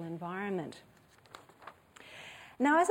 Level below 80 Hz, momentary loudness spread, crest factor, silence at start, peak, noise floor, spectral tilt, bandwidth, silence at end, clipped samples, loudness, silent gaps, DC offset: -76 dBFS; 26 LU; 20 dB; 0 s; -16 dBFS; -57 dBFS; -5 dB/octave; 16.5 kHz; 0 s; under 0.1%; -33 LUFS; none; under 0.1%